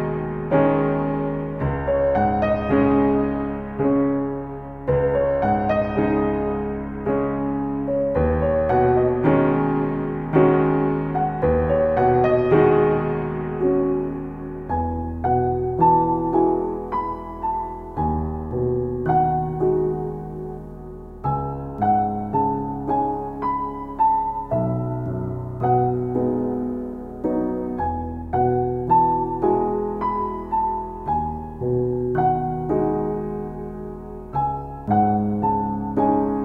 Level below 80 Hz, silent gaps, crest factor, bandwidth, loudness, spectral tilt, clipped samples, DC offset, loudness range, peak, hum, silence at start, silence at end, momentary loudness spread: -38 dBFS; none; 16 dB; 4.7 kHz; -22 LUFS; -11 dB/octave; under 0.1%; under 0.1%; 5 LU; -4 dBFS; none; 0 s; 0 s; 10 LU